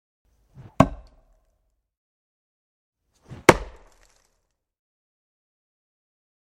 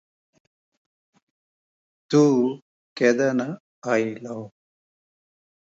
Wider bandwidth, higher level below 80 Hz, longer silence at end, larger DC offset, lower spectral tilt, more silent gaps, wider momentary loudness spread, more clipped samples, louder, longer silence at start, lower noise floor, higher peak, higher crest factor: first, 16 kHz vs 7.8 kHz; first, -46 dBFS vs -76 dBFS; first, 2.9 s vs 1.3 s; neither; about the same, -5 dB/octave vs -6 dB/octave; first, 1.97-2.93 s vs 2.62-2.96 s, 3.60-3.82 s; second, 12 LU vs 19 LU; neither; about the same, -21 LUFS vs -22 LUFS; second, 0.8 s vs 2.1 s; second, -74 dBFS vs under -90 dBFS; first, 0 dBFS vs -6 dBFS; first, 28 dB vs 20 dB